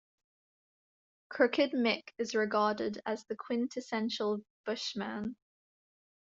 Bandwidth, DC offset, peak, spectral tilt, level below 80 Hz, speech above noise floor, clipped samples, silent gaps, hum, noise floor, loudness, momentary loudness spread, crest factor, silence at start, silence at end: 7.8 kHz; under 0.1%; -12 dBFS; -4.5 dB/octave; -76 dBFS; over 57 dB; under 0.1%; 4.50-4.64 s; none; under -90 dBFS; -33 LUFS; 10 LU; 22 dB; 1.3 s; 0.9 s